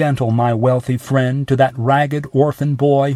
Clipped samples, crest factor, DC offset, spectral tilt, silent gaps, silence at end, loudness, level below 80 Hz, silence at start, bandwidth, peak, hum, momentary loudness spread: under 0.1%; 14 dB; under 0.1%; -8 dB/octave; none; 0 s; -16 LUFS; -50 dBFS; 0 s; 13.5 kHz; 0 dBFS; none; 3 LU